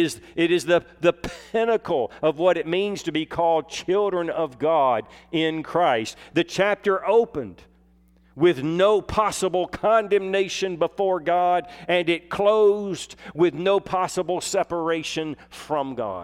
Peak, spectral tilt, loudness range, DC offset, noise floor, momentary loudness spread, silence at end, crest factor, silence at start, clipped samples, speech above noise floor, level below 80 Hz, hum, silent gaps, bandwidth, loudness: -6 dBFS; -4.5 dB/octave; 2 LU; under 0.1%; -57 dBFS; 8 LU; 0 s; 16 dB; 0 s; under 0.1%; 34 dB; -54 dBFS; none; none; 14.5 kHz; -23 LUFS